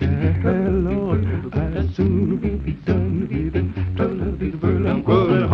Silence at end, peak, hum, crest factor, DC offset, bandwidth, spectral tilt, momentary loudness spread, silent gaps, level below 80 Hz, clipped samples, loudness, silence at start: 0 s; -2 dBFS; none; 16 dB; under 0.1%; 5.8 kHz; -10 dB/octave; 6 LU; none; -32 dBFS; under 0.1%; -21 LUFS; 0 s